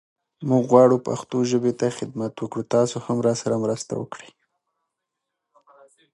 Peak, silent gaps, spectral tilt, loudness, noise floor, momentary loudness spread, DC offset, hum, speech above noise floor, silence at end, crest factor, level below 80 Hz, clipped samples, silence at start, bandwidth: -2 dBFS; none; -6.5 dB/octave; -22 LUFS; -82 dBFS; 15 LU; under 0.1%; none; 60 dB; 1.95 s; 22 dB; -66 dBFS; under 0.1%; 0.4 s; 11.5 kHz